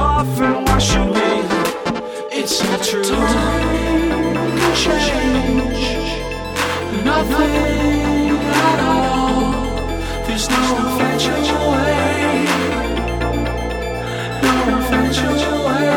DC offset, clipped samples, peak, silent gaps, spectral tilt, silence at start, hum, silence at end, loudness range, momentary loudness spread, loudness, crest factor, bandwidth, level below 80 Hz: under 0.1%; under 0.1%; -2 dBFS; none; -4.5 dB/octave; 0 s; none; 0 s; 2 LU; 7 LU; -17 LUFS; 16 dB; 19 kHz; -28 dBFS